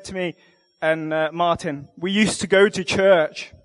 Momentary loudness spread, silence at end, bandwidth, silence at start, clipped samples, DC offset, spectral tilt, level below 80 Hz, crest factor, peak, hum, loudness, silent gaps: 12 LU; 0.2 s; 11.5 kHz; 0.05 s; under 0.1%; under 0.1%; -4.5 dB/octave; -52 dBFS; 18 dB; -2 dBFS; none; -20 LUFS; none